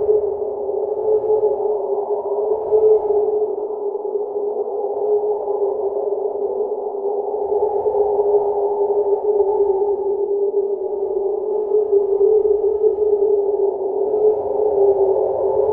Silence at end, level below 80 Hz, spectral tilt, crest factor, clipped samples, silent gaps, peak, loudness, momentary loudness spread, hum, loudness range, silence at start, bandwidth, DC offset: 0 s; -56 dBFS; -12 dB/octave; 14 dB; under 0.1%; none; -4 dBFS; -19 LUFS; 7 LU; none; 4 LU; 0 s; 1.4 kHz; under 0.1%